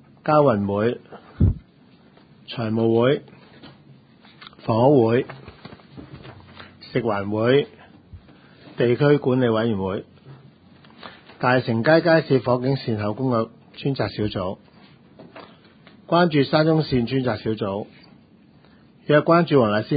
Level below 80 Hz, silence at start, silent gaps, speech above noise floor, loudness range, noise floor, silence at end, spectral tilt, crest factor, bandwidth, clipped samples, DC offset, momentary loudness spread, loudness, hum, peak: -44 dBFS; 0.25 s; none; 33 dB; 5 LU; -52 dBFS; 0 s; -12 dB/octave; 20 dB; 5 kHz; under 0.1%; under 0.1%; 23 LU; -21 LUFS; none; -2 dBFS